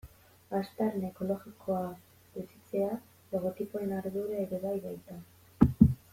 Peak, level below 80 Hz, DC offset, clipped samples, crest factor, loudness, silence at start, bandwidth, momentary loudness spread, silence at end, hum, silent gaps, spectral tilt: -6 dBFS; -50 dBFS; under 0.1%; under 0.1%; 26 dB; -33 LUFS; 0.05 s; 16.5 kHz; 17 LU; 0.2 s; none; none; -9 dB/octave